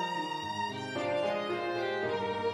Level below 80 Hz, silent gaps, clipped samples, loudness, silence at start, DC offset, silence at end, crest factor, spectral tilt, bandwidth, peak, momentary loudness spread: -72 dBFS; none; under 0.1%; -33 LUFS; 0 s; under 0.1%; 0 s; 12 dB; -5 dB/octave; 13 kHz; -22 dBFS; 3 LU